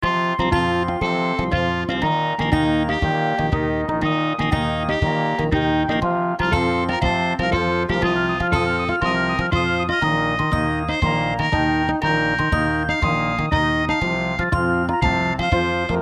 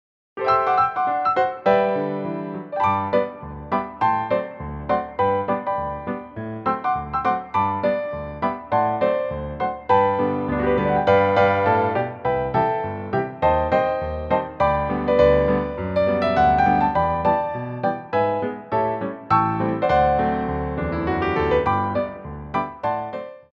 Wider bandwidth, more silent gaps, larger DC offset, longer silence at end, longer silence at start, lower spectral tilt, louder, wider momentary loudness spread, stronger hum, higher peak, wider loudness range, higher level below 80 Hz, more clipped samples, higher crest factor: first, 11 kHz vs 6.8 kHz; neither; neither; about the same, 0 s vs 0.1 s; second, 0 s vs 0.35 s; second, -6.5 dB/octave vs -8.5 dB/octave; about the same, -20 LUFS vs -21 LUFS; second, 2 LU vs 10 LU; neither; about the same, -2 dBFS vs -4 dBFS; second, 1 LU vs 4 LU; first, -32 dBFS vs -40 dBFS; neither; about the same, 18 dB vs 18 dB